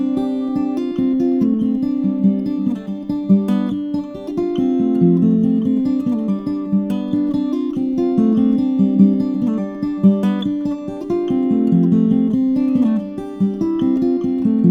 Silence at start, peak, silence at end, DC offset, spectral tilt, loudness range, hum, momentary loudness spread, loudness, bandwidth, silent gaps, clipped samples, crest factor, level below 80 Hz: 0 s; -2 dBFS; 0 s; under 0.1%; -10 dB/octave; 2 LU; none; 8 LU; -17 LUFS; 6 kHz; none; under 0.1%; 16 dB; -52 dBFS